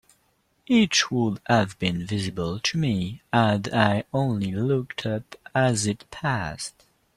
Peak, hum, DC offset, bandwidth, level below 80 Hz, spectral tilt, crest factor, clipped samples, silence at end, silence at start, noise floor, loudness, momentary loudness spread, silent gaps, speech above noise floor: -4 dBFS; none; under 0.1%; 13 kHz; -54 dBFS; -5 dB/octave; 20 dB; under 0.1%; 0.45 s; 0.7 s; -67 dBFS; -24 LUFS; 8 LU; none; 43 dB